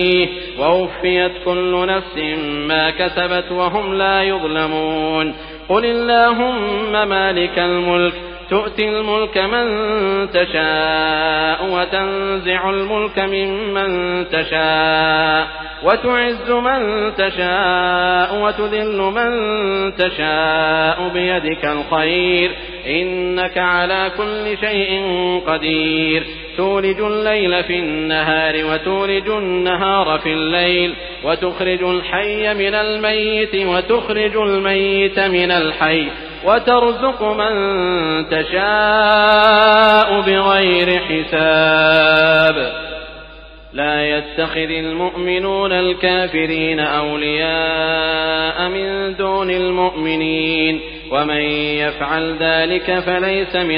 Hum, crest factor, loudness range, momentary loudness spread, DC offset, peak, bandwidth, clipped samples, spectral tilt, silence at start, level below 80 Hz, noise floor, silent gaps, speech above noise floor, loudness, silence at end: none; 16 dB; 5 LU; 7 LU; under 0.1%; 0 dBFS; 5.2 kHz; under 0.1%; -7 dB/octave; 0 s; -40 dBFS; -37 dBFS; none; 21 dB; -16 LUFS; 0 s